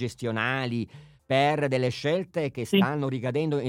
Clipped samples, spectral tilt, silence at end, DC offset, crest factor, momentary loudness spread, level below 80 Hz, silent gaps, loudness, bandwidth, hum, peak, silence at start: under 0.1%; -6.5 dB/octave; 0 s; under 0.1%; 18 dB; 7 LU; -66 dBFS; none; -27 LUFS; 15 kHz; none; -8 dBFS; 0 s